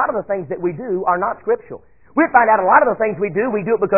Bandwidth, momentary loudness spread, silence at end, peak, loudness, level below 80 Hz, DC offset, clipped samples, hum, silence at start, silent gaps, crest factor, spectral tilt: 2.9 kHz; 11 LU; 0 s; 0 dBFS; -17 LUFS; -54 dBFS; 0.3%; under 0.1%; none; 0 s; none; 16 dB; -13.5 dB/octave